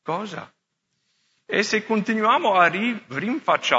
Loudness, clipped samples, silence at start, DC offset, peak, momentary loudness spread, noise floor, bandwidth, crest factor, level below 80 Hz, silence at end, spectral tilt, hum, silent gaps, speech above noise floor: -21 LUFS; under 0.1%; 0.05 s; under 0.1%; -2 dBFS; 11 LU; -75 dBFS; 8 kHz; 20 dB; -76 dBFS; 0 s; -4 dB/octave; none; none; 54 dB